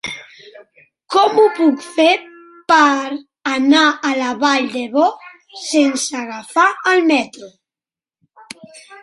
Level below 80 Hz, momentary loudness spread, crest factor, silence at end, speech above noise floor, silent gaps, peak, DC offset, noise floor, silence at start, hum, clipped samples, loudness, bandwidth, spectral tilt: -66 dBFS; 20 LU; 16 dB; 0.05 s; over 75 dB; none; 0 dBFS; under 0.1%; under -90 dBFS; 0.05 s; none; under 0.1%; -15 LUFS; 11.5 kHz; -2 dB/octave